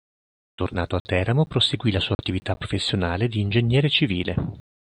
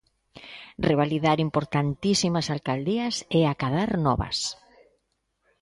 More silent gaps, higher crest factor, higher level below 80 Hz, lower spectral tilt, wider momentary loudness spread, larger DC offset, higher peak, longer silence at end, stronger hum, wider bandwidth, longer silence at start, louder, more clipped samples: first, 1.00-1.05 s, 2.15-2.19 s vs none; about the same, 18 dB vs 18 dB; about the same, -46 dBFS vs -48 dBFS; about the same, -6 dB/octave vs -5.5 dB/octave; about the same, 8 LU vs 8 LU; neither; about the same, -6 dBFS vs -8 dBFS; second, 0.4 s vs 1.1 s; neither; second, 10 kHz vs 11.5 kHz; first, 0.6 s vs 0.35 s; about the same, -23 LUFS vs -25 LUFS; neither